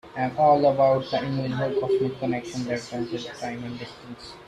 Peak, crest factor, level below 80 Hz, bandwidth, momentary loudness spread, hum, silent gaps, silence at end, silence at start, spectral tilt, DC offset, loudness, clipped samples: -8 dBFS; 18 dB; -58 dBFS; 12 kHz; 17 LU; none; none; 0.05 s; 0.05 s; -6.5 dB/octave; under 0.1%; -25 LUFS; under 0.1%